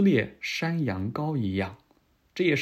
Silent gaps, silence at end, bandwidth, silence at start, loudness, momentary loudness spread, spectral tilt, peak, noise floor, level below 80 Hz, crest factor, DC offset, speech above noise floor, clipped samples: none; 0 s; 14 kHz; 0 s; -28 LUFS; 7 LU; -6.5 dB/octave; -12 dBFS; -65 dBFS; -66 dBFS; 16 dB; under 0.1%; 39 dB; under 0.1%